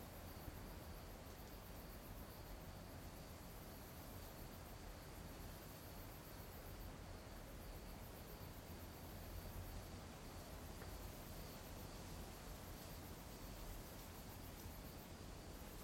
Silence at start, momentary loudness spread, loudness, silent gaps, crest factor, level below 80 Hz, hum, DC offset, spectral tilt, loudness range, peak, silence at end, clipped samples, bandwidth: 0 s; 2 LU; -55 LUFS; none; 16 dB; -60 dBFS; none; under 0.1%; -4.5 dB/octave; 1 LU; -38 dBFS; 0 s; under 0.1%; 16.5 kHz